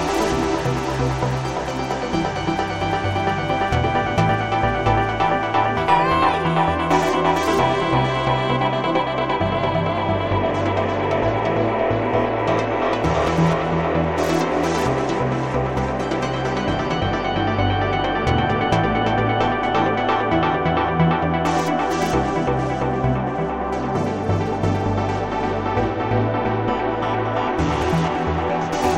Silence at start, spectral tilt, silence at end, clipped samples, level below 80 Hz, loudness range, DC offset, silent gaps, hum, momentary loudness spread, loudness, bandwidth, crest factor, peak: 0 s; -6 dB/octave; 0 s; under 0.1%; -36 dBFS; 3 LU; 0.4%; none; none; 4 LU; -20 LUFS; 16 kHz; 16 dB; -4 dBFS